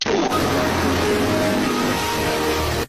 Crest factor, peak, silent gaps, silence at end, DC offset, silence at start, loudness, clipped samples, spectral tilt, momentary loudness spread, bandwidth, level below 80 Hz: 10 dB; -10 dBFS; none; 0 s; under 0.1%; 0 s; -20 LUFS; under 0.1%; -4.5 dB/octave; 2 LU; 16 kHz; -38 dBFS